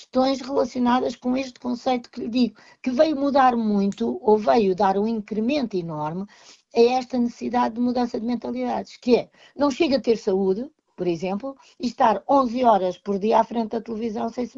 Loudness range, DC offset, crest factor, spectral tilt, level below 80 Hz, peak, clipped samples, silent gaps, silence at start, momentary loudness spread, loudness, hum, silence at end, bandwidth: 3 LU; under 0.1%; 18 dB; -6.5 dB/octave; -58 dBFS; -4 dBFS; under 0.1%; none; 0 s; 10 LU; -23 LUFS; none; 0.1 s; 7.6 kHz